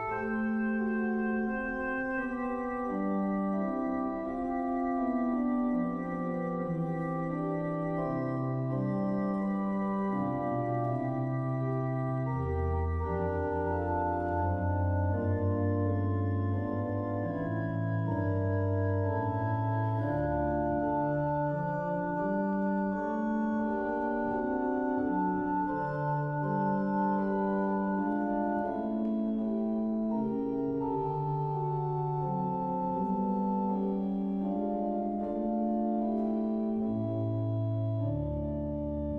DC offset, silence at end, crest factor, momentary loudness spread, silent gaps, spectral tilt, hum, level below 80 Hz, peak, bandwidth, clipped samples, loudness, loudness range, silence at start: under 0.1%; 0 s; 12 dB; 3 LU; none; -11 dB/octave; none; -50 dBFS; -18 dBFS; 5.6 kHz; under 0.1%; -32 LUFS; 2 LU; 0 s